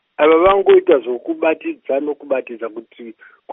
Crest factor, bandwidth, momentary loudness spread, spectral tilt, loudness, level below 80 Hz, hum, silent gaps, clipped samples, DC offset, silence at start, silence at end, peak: 16 dB; 3.8 kHz; 17 LU; -2.5 dB/octave; -15 LUFS; -48 dBFS; none; none; under 0.1%; under 0.1%; 0.2 s; 0 s; 0 dBFS